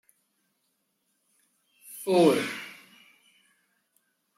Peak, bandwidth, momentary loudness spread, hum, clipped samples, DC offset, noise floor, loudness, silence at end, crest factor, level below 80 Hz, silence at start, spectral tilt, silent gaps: -8 dBFS; 16 kHz; 24 LU; none; under 0.1%; under 0.1%; -76 dBFS; -25 LUFS; 1.65 s; 24 dB; -80 dBFS; 1.9 s; -5 dB/octave; none